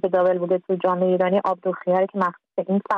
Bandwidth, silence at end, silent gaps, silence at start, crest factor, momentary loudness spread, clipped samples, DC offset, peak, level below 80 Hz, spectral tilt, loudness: 5.2 kHz; 0 s; none; 0.05 s; 14 dB; 5 LU; under 0.1%; under 0.1%; -8 dBFS; -70 dBFS; -9 dB/octave; -22 LUFS